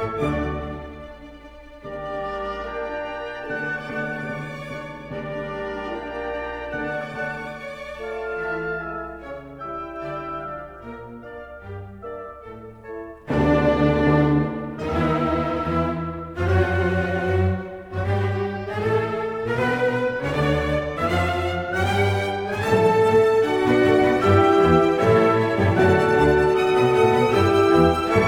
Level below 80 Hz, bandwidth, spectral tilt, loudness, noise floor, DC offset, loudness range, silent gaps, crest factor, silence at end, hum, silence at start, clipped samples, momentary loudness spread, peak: -40 dBFS; 16 kHz; -7 dB/octave; -21 LUFS; -42 dBFS; under 0.1%; 13 LU; none; 18 dB; 0 s; none; 0 s; under 0.1%; 19 LU; -4 dBFS